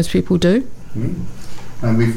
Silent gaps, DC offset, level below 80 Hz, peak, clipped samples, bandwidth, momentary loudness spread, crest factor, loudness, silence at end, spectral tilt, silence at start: none; under 0.1%; -36 dBFS; -4 dBFS; under 0.1%; 16 kHz; 19 LU; 14 dB; -18 LUFS; 0 s; -7 dB/octave; 0 s